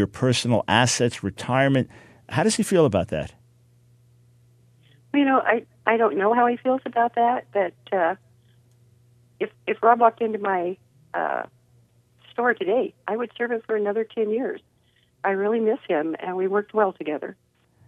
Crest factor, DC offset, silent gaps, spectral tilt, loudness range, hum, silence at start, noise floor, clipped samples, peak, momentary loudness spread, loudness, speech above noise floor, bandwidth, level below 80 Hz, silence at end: 22 dB; under 0.1%; none; -5 dB/octave; 4 LU; 60 Hz at -55 dBFS; 0 s; -63 dBFS; under 0.1%; -2 dBFS; 12 LU; -23 LUFS; 41 dB; 14 kHz; -60 dBFS; 0.55 s